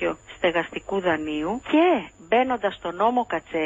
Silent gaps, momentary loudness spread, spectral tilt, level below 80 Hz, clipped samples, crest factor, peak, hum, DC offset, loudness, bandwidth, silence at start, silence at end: none; 8 LU; -5.5 dB/octave; -54 dBFS; under 0.1%; 16 dB; -8 dBFS; none; under 0.1%; -24 LUFS; 7.8 kHz; 0 s; 0 s